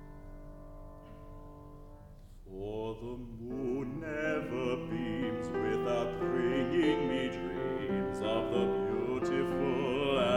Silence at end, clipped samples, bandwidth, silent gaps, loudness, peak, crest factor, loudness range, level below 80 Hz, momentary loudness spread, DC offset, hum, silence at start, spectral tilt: 0 s; under 0.1%; 12 kHz; none; -34 LUFS; -16 dBFS; 18 dB; 11 LU; -52 dBFS; 21 LU; under 0.1%; none; 0 s; -6.5 dB/octave